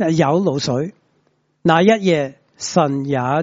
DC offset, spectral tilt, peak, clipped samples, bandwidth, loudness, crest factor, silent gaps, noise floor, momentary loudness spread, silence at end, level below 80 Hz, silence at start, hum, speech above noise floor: under 0.1%; -5.5 dB/octave; 0 dBFS; under 0.1%; 8 kHz; -17 LUFS; 18 dB; none; -63 dBFS; 12 LU; 0 s; -58 dBFS; 0 s; none; 47 dB